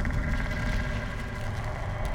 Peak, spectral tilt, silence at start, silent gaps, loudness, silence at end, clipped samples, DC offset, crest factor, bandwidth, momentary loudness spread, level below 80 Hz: -18 dBFS; -6 dB/octave; 0 s; none; -32 LUFS; 0 s; under 0.1%; under 0.1%; 12 dB; 15.5 kHz; 4 LU; -32 dBFS